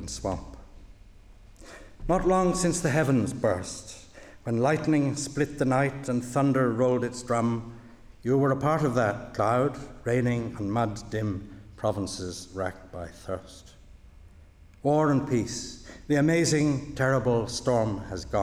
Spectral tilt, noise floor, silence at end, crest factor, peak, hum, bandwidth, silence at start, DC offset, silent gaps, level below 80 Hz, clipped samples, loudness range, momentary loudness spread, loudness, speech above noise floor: -6 dB/octave; -52 dBFS; 0 s; 16 dB; -10 dBFS; none; 14.5 kHz; 0 s; under 0.1%; none; -48 dBFS; under 0.1%; 7 LU; 14 LU; -27 LUFS; 26 dB